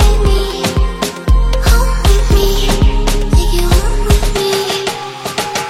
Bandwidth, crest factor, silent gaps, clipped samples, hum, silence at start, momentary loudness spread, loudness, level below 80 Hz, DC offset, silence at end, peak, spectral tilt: 15.5 kHz; 12 dB; none; under 0.1%; none; 0 s; 5 LU; -14 LUFS; -12 dBFS; under 0.1%; 0 s; 0 dBFS; -4.5 dB/octave